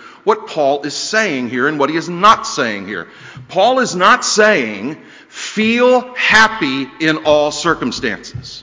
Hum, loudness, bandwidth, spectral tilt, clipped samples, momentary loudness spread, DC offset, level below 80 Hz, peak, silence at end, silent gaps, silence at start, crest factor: none; -14 LUFS; 8 kHz; -3 dB/octave; 0.2%; 15 LU; under 0.1%; -50 dBFS; 0 dBFS; 0 s; none; 0 s; 14 dB